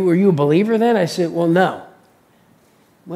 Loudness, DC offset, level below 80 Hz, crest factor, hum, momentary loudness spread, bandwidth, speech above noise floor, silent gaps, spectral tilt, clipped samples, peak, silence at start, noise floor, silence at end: -16 LUFS; under 0.1%; -68 dBFS; 18 dB; none; 5 LU; 14.5 kHz; 39 dB; none; -7 dB/octave; under 0.1%; 0 dBFS; 0 s; -54 dBFS; 0 s